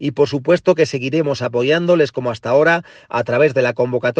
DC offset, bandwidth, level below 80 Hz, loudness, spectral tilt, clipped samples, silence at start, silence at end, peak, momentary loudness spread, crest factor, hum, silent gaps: under 0.1%; 8.8 kHz; -58 dBFS; -16 LUFS; -6 dB/octave; under 0.1%; 0 s; 0.05 s; 0 dBFS; 5 LU; 16 dB; none; none